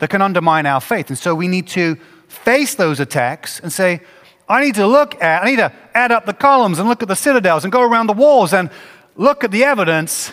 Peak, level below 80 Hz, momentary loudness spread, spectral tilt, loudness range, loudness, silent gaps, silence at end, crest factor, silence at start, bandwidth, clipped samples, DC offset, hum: 0 dBFS; -62 dBFS; 7 LU; -4.5 dB/octave; 4 LU; -14 LUFS; none; 0 s; 14 dB; 0 s; 16 kHz; under 0.1%; under 0.1%; none